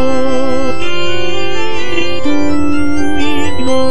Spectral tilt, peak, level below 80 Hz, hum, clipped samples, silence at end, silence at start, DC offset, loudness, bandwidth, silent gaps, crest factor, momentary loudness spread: -5 dB/octave; 0 dBFS; -36 dBFS; none; under 0.1%; 0 s; 0 s; 50%; -16 LUFS; 11 kHz; none; 12 dB; 3 LU